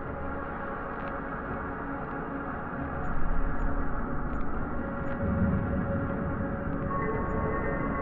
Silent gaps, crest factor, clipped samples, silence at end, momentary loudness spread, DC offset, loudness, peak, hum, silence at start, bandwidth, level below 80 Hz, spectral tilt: none; 14 dB; under 0.1%; 0 s; 6 LU; under 0.1%; -33 LUFS; -16 dBFS; none; 0 s; 3.6 kHz; -36 dBFS; -11 dB/octave